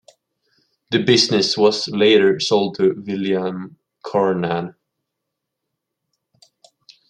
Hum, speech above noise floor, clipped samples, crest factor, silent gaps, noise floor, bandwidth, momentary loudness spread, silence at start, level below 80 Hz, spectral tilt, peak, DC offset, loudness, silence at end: none; 62 dB; under 0.1%; 18 dB; none; -80 dBFS; 10.5 kHz; 13 LU; 0.9 s; -66 dBFS; -4.5 dB/octave; -2 dBFS; under 0.1%; -17 LUFS; 2.4 s